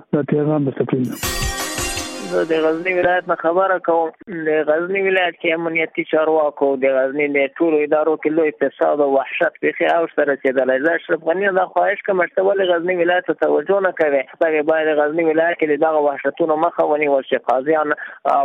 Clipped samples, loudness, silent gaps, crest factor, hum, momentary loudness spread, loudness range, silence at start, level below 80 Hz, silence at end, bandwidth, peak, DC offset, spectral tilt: under 0.1%; -18 LUFS; none; 14 dB; none; 4 LU; 2 LU; 0.15 s; -44 dBFS; 0 s; 15 kHz; -4 dBFS; under 0.1%; -5 dB/octave